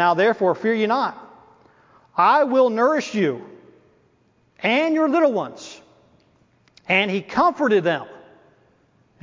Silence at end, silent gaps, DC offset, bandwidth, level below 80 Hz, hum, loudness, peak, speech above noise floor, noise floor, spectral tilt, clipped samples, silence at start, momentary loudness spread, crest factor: 1.05 s; none; under 0.1%; 7.6 kHz; -66 dBFS; none; -20 LUFS; -4 dBFS; 42 dB; -61 dBFS; -5.5 dB/octave; under 0.1%; 0 s; 14 LU; 18 dB